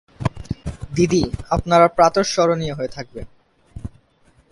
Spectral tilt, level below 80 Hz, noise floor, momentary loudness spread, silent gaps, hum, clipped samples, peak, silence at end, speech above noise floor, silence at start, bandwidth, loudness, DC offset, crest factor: -5.5 dB/octave; -38 dBFS; -56 dBFS; 22 LU; none; none; under 0.1%; 0 dBFS; 0.65 s; 39 dB; 0.2 s; 11.5 kHz; -19 LUFS; under 0.1%; 20 dB